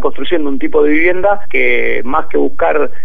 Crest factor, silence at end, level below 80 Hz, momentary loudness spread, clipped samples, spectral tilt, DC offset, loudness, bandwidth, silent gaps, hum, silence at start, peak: 14 dB; 0 s; -38 dBFS; 5 LU; under 0.1%; -7 dB/octave; 30%; -14 LUFS; 4.6 kHz; none; none; 0 s; 0 dBFS